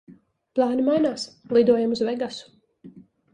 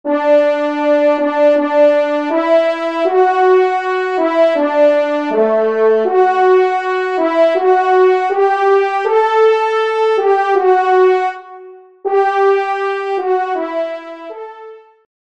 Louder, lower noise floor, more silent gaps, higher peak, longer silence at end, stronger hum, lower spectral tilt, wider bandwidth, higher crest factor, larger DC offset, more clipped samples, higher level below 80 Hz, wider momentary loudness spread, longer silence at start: second, -23 LUFS vs -13 LUFS; first, -48 dBFS vs -37 dBFS; neither; second, -6 dBFS vs -2 dBFS; about the same, 0.35 s vs 0.45 s; neither; about the same, -5.5 dB/octave vs -4.5 dB/octave; first, 10 kHz vs 7.8 kHz; first, 18 dB vs 12 dB; second, under 0.1% vs 0.2%; neither; first, -64 dBFS vs -70 dBFS; first, 13 LU vs 7 LU; about the same, 0.1 s vs 0.05 s